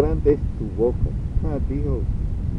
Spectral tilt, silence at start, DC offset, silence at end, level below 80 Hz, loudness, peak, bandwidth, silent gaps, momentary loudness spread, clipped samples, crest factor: -11 dB/octave; 0 s; under 0.1%; 0 s; -26 dBFS; -24 LUFS; -6 dBFS; 5.6 kHz; none; 6 LU; under 0.1%; 16 dB